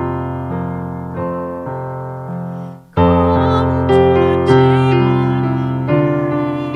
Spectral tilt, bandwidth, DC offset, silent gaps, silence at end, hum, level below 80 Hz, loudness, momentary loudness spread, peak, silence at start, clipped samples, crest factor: -9 dB/octave; 6.2 kHz; under 0.1%; none; 0 s; none; -42 dBFS; -15 LUFS; 14 LU; 0 dBFS; 0 s; under 0.1%; 14 dB